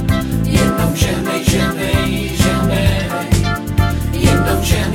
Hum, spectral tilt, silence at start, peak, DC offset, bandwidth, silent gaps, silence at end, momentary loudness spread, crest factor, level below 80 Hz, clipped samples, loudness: none; -5.5 dB/octave; 0 s; 0 dBFS; under 0.1%; 17 kHz; none; 0 s; 3 LU; 14 dB; -24 dBFS; under 0.1%; -16 LUFS